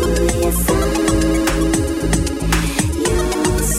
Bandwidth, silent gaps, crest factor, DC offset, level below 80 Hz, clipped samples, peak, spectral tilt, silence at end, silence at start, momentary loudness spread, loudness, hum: 16.5 kHz; none; 14 dB; under 0.1%; -22 dBFS; under 0.1%; -2 dBFS; -4.5 dB/octave; 0 s; 0 s; 2 LU; -17 LUFS; none